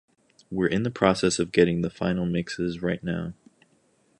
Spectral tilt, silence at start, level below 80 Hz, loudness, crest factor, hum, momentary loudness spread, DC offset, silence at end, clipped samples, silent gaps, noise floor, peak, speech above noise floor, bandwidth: -5.5 dB/octave; 0.5 s; -52 dBFS; -25 LUFS; 22 dB; none; 9 LU; under 0.1%; 0.85 s; under 0.1%; none; -65 dBFS; -4 dBFS; 40 dB; 11 kHz